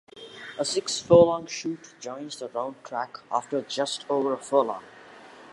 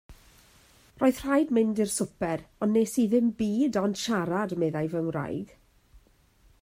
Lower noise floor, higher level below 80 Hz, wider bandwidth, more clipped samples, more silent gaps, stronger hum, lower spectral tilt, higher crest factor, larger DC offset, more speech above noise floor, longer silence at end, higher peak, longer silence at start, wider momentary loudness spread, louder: second, -48 dBFS vs -61 dBFS; about the same, -60 dBFS vs -58 dBFS; second, 11.5 kHz vs 16 kHz; neither; neither; neither; about the same, -4.5 dB/octave vs -5.5 dB/octave; first, 24 dB vs 16 dB; neither; second, 22 dB vs 35 dB; second, 0 s vs 0.65 s; first, -4 dBFS vs -12 dBFS; about the same, 0.15 s vs 0.1 s; first, 19 LU vs 8 LU; about the same, -26 LUFS vs -27 LUFS